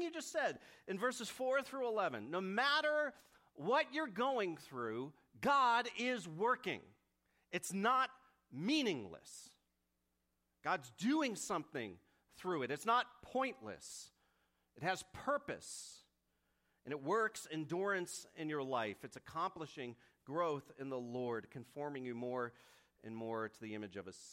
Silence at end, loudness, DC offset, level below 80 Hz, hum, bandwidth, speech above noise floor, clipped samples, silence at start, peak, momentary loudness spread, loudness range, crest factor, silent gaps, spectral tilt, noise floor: 0 s; -40 LUFS; under 0.1%; -80 dBFS; none; 16 kHz; 45 dB; under 0.1%; 0 s; -22 dBFS; 15 LU; 7 LU; 20 dB; none; -4 dB/octave; -85 dBFS